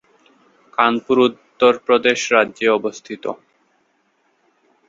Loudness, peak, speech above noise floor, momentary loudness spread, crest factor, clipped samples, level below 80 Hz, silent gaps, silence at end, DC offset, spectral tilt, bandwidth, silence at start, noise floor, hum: -17 LUFS; 0 dBFS; 47 dB; 13 LU; 20 dB; under 0.1%; -64 dBFS; none; 1.55 s; under 0.1%; -3.5 dB/octave; 7.8 kHz; 0.8 s; -64 dBFS; none